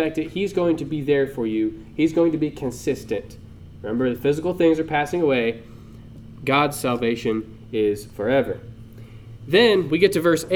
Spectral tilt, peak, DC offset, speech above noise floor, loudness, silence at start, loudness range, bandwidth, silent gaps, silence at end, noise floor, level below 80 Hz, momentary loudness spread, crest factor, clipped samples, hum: -5.5 dB/octave; -2 dBFS; under 0.1%; 20 dB; -22 LUFS; 0 s; 2 LU; 17.5 kHz; none; 0 s; -41 dBFS; -48 dBFS; 18 LU; 20 dB; under 0.1%; none